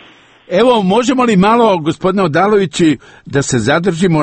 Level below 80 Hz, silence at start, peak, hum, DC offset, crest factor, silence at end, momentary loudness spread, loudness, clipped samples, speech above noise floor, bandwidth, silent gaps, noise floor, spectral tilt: -44 dBFS; 0.5 s; 0 dBFS; none; under 0.1%; 12 dB; 0 s; 6 LU; -12 LUFS; under 0.1%; 31 dB; 8.8 kHz; none; -42 dBFS; -5.5 dB/octave